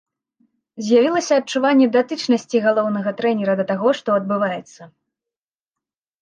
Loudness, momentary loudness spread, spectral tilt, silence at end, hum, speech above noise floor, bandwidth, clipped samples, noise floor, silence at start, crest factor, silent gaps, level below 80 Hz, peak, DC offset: -18 LUFS; 6 LU; -5 dB/octave; 1.35 s; none; 71 dB; 9.4 kHz; under 0.1%; -89 dBFS; 0.75 s; 16 dB; none; -74 dBFS; -4 dBFS; under 0.1%